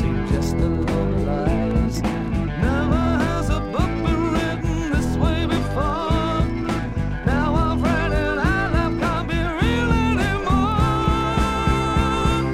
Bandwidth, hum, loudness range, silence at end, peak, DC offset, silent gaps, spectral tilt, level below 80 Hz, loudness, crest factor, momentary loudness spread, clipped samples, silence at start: 14.5 kHz; none; 2 LU; 0 s; -6 dBFS; under 0.1%; none; -6.5 dB/octave; -26 dBFS; -21 LUFS; 14 dB; 4 LU; under 0.1%; 0 s